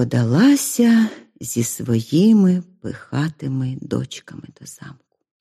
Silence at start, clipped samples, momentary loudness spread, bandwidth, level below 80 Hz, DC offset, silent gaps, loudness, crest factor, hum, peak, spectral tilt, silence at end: 0 s; under 0.1%; 23 LU; 15 kHz; -60 dBFS; under 0.1%; none; -18 LUFS; 14 dB; none; -4 dBFS; -6 dB/octave; 0.5 s